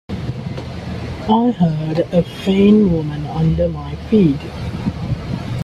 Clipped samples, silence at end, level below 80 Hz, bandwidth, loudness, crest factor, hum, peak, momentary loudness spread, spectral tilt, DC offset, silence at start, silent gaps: under 0.1%; 0 s; -36 dBFS; 10.5 kHz; -18 LUFS; 16 dB; none; -2 dBFS; 14 LU; -8.5 dB/octave; under 0.1%; 0.1 s; none